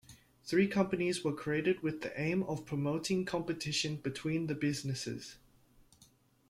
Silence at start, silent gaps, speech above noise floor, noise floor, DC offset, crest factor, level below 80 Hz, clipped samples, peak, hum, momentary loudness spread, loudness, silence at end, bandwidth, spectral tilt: 0.1 s; none; 32 dB; -66 dBFS; under 0.1%; 18 dB; -66 dBFS; under 0.1%; -16 dBFS; none; 7 LU; -35 LUFS; 1.15 s; 15.5 kHz; -5 dB/octave